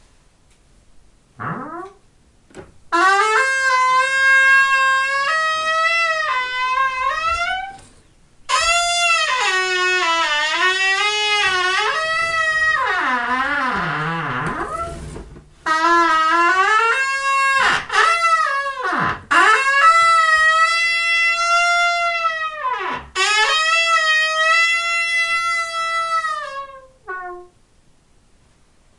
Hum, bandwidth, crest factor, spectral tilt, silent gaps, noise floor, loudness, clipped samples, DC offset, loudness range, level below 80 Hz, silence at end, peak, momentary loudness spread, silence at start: none; 11.5 kHz; 18 dB; -1.5 dB/octave; none; -54 dBFS; -16 LUFS; under 0.1%; under 0.1%; 6 LU; -48 dBFS; 1.55 s; 0 dBFS; 12 LU; 1.4 s